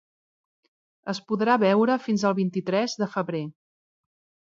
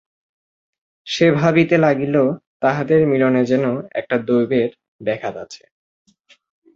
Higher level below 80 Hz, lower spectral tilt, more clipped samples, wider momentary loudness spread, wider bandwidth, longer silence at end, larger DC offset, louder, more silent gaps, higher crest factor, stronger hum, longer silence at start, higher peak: second, -76 dBFS vs -58 dBFS; about the same, -6 dB/octave vs -7 dB/octave; neither; about the same, 13 LU vs 11 LU; about the same, 7.6 kHz vs 7.8 kHz; second, 1 s vs 1.2 s; neither; second, -24 LUFS vs -18 LUFS; second, none vs 2.46-2.60 s, 4.88-4.99 s; about the same, 18 dB vs 18 dB; neither; about the same, 1.05 s vs 1.05 s; second, -8 dBFS vs -2 dBFS